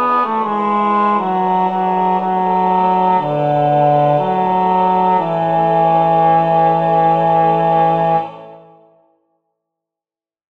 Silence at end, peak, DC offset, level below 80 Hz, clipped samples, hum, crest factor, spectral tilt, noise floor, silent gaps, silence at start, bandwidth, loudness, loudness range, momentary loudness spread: 1.9 s; -2 dBFS; 0.4%; -70 dBFS; under 0.1%; none; 12 dB; -9 dB/octave; under -90 dBFS; none; 0 s; 5.2 kHz; -14 LUFS; 3 LU; 4 LU